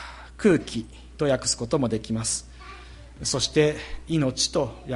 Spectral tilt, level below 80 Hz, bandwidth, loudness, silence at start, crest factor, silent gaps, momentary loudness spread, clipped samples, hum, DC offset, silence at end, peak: -4 dB/octave; -44 dBFS; 11.5 kHz; -25 LUFS; 0 s; 18 dB; none; 20 LU; under 0.1%; none; under 0.1%; 0 s; -6 dBFS